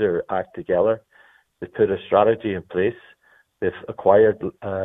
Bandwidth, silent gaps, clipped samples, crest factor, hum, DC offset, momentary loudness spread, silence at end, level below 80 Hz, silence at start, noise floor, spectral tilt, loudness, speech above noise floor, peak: 3.9 kHz; none; under 0.1%; 20 dB; none; under 0.1%; 12 LU; 0 s; -56 dBFS; 0 s; -55 dBFS; -9.5 dB/octave; -21 LUFS; 35 dB; -2 dBFS